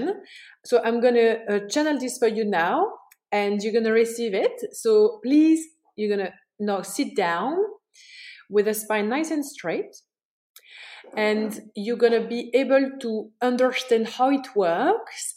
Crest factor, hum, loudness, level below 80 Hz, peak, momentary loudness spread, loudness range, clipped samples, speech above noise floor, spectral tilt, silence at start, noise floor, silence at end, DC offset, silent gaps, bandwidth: 16 dB; none; -23 LUFS; -82 dBFS; -6 dBFS; 12 LU; 5 LU; under 0.1%; 26 dB; -4.5 dB/octave; 0 s; -48 dBFS; 0.05 s; under 0.1%; 10.25-10.55 s; 16.5 kHz